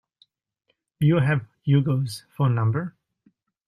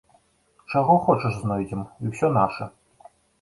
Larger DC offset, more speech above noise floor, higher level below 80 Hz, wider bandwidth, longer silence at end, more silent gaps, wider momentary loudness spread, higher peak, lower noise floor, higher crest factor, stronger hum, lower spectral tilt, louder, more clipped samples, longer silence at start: neither; first, 52 dB vs 40 dB; second, -60 dBFS vs -54 dBFS; first, 13 kHz vs 11.5 kHz; about the same, 0.8 s vs 0.7 s; neither; second, 9 LU vs 13 LU; about the same, -8 dBFS vs -6 dBFS; first, -73 dBFS vs -62 dBFS; about the same, 16 dB vs 18 dB; neither; about the same, -8 dB/octave vs -8 dB/octave; about the same, -23 LUFS vs -23 LUFS; neither; first, 1 s vs 0.7 s